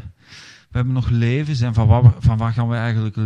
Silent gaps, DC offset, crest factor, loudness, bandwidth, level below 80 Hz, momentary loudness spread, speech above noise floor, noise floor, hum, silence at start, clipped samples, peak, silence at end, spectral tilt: none; under 0.1%; 16 dB; -18 LUFS; 7.2 kHz; -36 dBFS; 8 LU; 27 dB; -43 dBFS; none; 0 s; under 0.1%; 0 dBFS; 0 s; -8.5 dB/octave